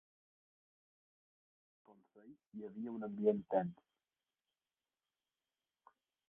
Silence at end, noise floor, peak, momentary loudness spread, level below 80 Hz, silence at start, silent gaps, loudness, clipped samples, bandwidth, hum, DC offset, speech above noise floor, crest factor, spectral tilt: 2.55 s; under -90 dBFS; -20 dBFS; 16 LU; -86 dBFS; 1.9 s; none; -39 LUFS; under 0.1%; 3.7 kHz; none; under 0.1%; over 50 dB; 24 dB; -5.5 dB/octave